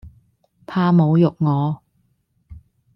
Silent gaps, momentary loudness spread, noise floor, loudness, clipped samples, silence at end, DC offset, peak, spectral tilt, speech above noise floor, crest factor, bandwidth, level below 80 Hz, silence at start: none; 12 LU; -65 dBFS; -18 LUFS; under 0.1%; 0.4 s; under 0.1%; -6 dBFS; -10.5 dB/octave; 49 dB; 16 dB; 5.6 kHz; -52 dBFS; 0.05 s